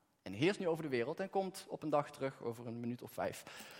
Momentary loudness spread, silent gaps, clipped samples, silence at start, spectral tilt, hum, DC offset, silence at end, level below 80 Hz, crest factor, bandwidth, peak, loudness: 9 LU; none; under 0.1%; 0.25 s; -5.5 dB/octave; none; under 0.1%; 0 s; -82 dBFS; 20 dB; 16.5 kHz; -20 dBFS; -40 LUFS